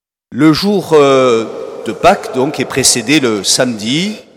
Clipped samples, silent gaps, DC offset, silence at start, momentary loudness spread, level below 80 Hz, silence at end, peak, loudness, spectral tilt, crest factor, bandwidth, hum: 0.2%; none; under 0.1%; 0.3 s; 9 LU; -46 dBFS; 0.15 s; 0 dBFS; -11 LUFS; -3.5 dB/octave; 12 dB; 19.5 kHz; none